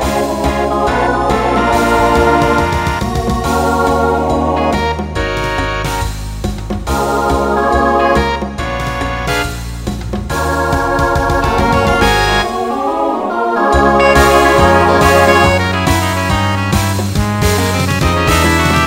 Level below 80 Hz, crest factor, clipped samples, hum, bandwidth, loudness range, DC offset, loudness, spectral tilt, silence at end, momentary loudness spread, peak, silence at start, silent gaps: -24 dBFS; 12 dB; under 0.1%; none; 16.5 kHz; 6 LU; under 0.1%; -13 LUFS; -5 dB/octave; 0 s; 9 LU; 0 dBFS; 0 s; none